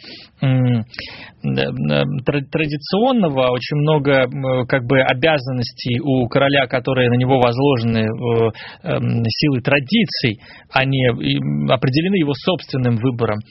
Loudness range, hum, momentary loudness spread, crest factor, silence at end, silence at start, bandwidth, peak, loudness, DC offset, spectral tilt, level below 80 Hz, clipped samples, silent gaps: 2 LU; none; 7 LU; 18 dB; 0.1 s; 0.05 s; 6 kHz; 0 dBFS; -17 LUFS; under 0.1%; -5 dB/octave; -48 dBFS; under 0.1%; none